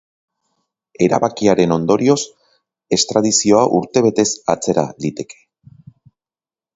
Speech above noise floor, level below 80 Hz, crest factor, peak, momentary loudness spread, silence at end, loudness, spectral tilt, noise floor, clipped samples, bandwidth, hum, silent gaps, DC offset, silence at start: over 75 dB; -54 dBFS; 18 dB; 0 dBFS; 11 LU; 1.45 s; -16 LUFS; -4.5 dB/octave; under -90 dBFS; under 0.1%; 8 kHz; none; none; under 0.1%; 1 s